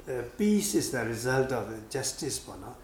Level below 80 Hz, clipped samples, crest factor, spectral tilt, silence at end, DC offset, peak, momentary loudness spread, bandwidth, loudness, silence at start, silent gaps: -54 dBFS; under 0.1%; 16 dB; -4 dB/octave; 0 s; under 0.1%; -14 dBFS; 10 LU; 19 kHz; -30 LUFS; 0 s; none